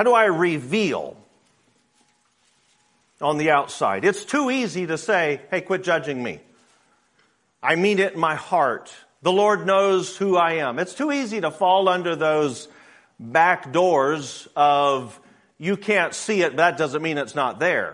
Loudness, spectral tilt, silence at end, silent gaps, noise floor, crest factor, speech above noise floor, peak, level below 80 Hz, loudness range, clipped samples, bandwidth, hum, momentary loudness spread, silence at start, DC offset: -21 LUFS; -4.5 dB/octave; 0 s; none; -64 dBFS; 20 dB; 43 dB; -2 dBFS; -70 dBFS; 4 LU; under 0.1%; 11 kHz; none; 9 LU; 0 s; under 0.1%